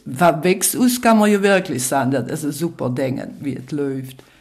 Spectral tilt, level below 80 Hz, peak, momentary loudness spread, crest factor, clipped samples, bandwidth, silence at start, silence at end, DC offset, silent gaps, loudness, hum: -4.5 dB/octave; -58 dBFS; -2 dBFS; 12 LU; 16 dB; under 0.1%; 16 kHz; 0.05 s; 0.25 s; under 0.1%; none; -18 LUFS; none